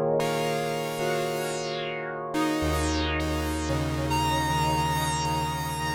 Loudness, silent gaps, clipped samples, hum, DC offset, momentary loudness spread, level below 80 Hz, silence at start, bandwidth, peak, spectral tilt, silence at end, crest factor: -27 LUFS; none; under 0.1%; none; under 0.1%; 5 LU; -42 dBFS; 0 s; 19.5 kHz; -14 dBFS; -4.5 dB/octave; 0 s; 12 dB